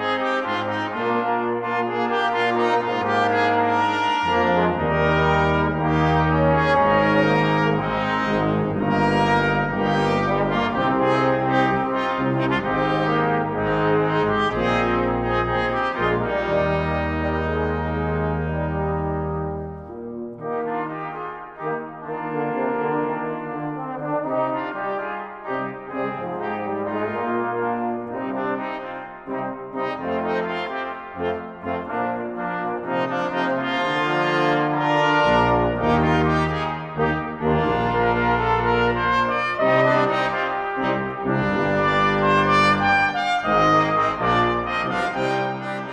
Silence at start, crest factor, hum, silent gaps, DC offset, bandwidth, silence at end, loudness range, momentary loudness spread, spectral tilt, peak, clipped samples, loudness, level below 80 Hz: 0 s; 16 dB; none; none; under 0.1%; 9.6 kHz; 0 s; 8 LU; 10 LU; -7 dB/octave; -6 dBFS; under 0.1%; -21 LUFS; -42 dBFS